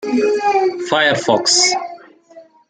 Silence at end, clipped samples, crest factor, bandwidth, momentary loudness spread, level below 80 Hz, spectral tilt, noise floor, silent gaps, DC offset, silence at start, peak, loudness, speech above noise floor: 0.25 s; under 0.1%; 16 dB; 9.6 kHz; 7 LU; -64 dBFS; -2 dB/octave; -44 dBFS; none; under 0.1%; 0 s; -2 dBFS; -14 LUFS; 29 dB